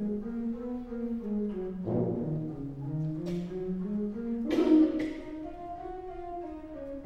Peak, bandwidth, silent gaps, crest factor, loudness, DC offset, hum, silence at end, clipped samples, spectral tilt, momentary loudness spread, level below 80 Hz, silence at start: -12 dBFS; 7.2 kHz; none; 20 dB; -33 LUFS; under 0.1%; none; 0 s; under 0.1%; -9 dB/octave; 15 LU; -52 dBFS; 0 s